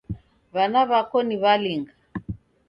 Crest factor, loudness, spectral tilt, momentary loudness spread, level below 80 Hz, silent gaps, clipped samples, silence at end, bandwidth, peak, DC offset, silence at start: 18 dB; -22 LUFS; -8 dB/octave; 18 LU; -50 dBFS; none; under 0.1%; 0.3 s; 5.6 kHz; -6 dBFS; under 0.1%; 0.1 s